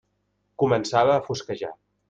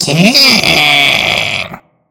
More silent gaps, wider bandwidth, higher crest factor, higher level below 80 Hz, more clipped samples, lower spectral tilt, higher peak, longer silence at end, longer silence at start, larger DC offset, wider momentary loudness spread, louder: neither; second, 9.2 kHz vs over 20 kHz; first, 20 dB vs 10 dB; second, -60 dBFS vs -44 dBFS; second, under 0.1% vs 2%; first, -5.5 dB/octave vs -3 dB/octave; second, -6 dBFS vs 0 dBFS; about the same, 0.35 s vs 0.3 s; first, 0.6 s vs 0 s; neither; about the same, 13 LU vs 11 LU; second, -23 LUFS vs -7 LUFS